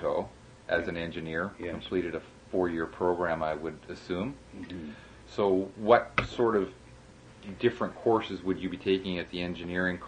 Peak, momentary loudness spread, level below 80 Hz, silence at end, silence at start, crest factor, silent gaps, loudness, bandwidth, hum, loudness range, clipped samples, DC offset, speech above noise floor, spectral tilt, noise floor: -8 dBFS; 14 LU; -56 dBFS; 0 s; 0 s; 22 dB; none; -30 LUFS; 9.8 kHz; none; 4 LU; under 0.1%; under 0.1%; 22 dB; -6.5 dB/octave; -52 dBFS